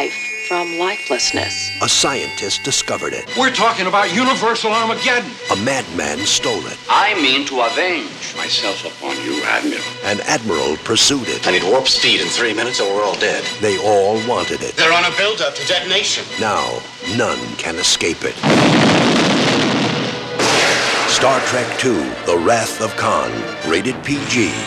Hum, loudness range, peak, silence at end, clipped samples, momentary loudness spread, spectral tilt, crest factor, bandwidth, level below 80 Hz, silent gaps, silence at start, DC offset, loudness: none; 3 LU; -2 dBFS; 0 s; under 0.1%; 8 LU; -2.5 dB/octave; 16 dB; 15.5 kHz; -52 dBFS; none; 0 s; under 0.1%; -16 LUFS